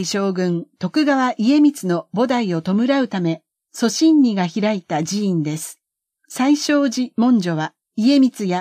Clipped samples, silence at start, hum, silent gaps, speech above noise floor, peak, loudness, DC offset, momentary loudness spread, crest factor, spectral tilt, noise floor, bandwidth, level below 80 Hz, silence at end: under 0.1%; 0 s; none; none; 50 dB; -6 dBFS; -18 LUFS; under 0.1%; 10 LU; 12 dB; -5.5 dB/octave; -68 dBFS; 15.5 kHz; -72 dBFS; 0 s